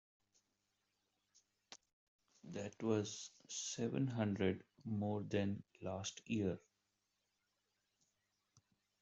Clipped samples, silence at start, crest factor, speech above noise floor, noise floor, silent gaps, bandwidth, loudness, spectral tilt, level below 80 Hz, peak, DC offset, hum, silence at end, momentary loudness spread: under 0.1%; 1.7 s; 20 dB; 45 dB; -87 dBFS; 1.93-2.19 s; 8.2 kHz; -43 LUFS; -5.5 dB/octave; -80 dBFS; -24 dBFS; under 0.1%; none; 2.45 s; 12 LU